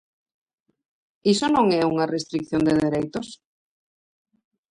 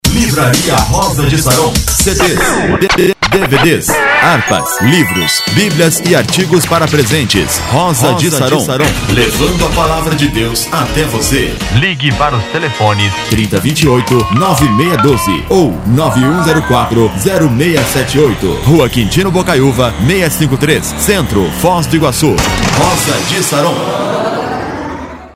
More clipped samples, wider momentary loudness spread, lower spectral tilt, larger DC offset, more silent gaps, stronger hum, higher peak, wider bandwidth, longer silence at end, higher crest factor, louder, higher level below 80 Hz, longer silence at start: second, under 0.1% vs 0.3%; first, 11 LU vs 4 LU; about the same, -5.5 dB/octave vs -4.5 dB/octave; neither; neither; neither; second, -8 dBFS vs 0 dBFS; second, 11 kHz vs 16.5 kHz; first, 1.35 s vs 0.05 s; first, 18 dB vs 10 dB; second, -22 LUFS vs -10 LUFS; second, -58 dBFS vs -26 dBFS; first, 1.25 s vs 0.05 s